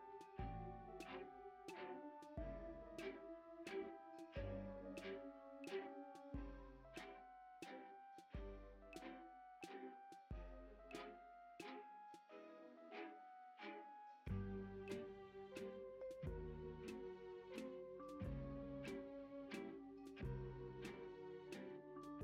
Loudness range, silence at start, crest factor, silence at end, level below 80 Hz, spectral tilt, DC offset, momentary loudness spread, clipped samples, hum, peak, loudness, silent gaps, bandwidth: 5 LU; 0 s; 16 dB; 0 s; -62 dBFS; -6.5 dB/octave; under 0.1%; 9 LU; under 0.1%; none; -36 dBFS; -55 LUFS; none; 15.5 kHz